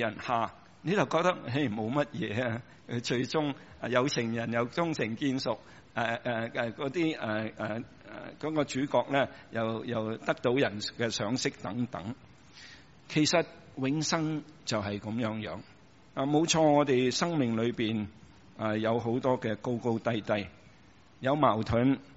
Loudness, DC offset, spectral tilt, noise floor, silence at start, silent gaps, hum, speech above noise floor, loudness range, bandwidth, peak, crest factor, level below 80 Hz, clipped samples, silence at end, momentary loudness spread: -31 LUFS; under 0.1%; -4.5 dB/octave; -58 dBFS; 0 s; none; none; 28 dB; 4 LU; 8 kHz; -10 dBFS; 22 dB; -62 dBFS; under 0.1%; 0 s; 13 LU